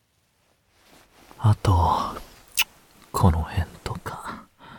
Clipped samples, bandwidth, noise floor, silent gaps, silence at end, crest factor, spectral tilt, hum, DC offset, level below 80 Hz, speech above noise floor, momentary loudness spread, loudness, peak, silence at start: under 0.1%; 19 kHz; -67 dBFS; none; 0 s; 20 dB; -5 dB/octave; none; under 0.1%; -38 dBFS; 46 dB; 15 LU; -25 LUFS; -6 dBFS; 1.4 s